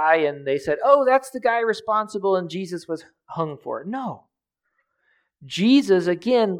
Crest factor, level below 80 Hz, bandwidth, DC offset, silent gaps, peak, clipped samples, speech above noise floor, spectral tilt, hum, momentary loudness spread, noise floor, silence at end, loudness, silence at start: 20 dB; -68 dBFS; 13.5 kHz; under 0.1%; none; -2 dBFS; under 0.1%; 56 dB; -5.5 dB/octave; none; 15 LU; -77 dBFS; 0 s; -21 LUFS; 0 s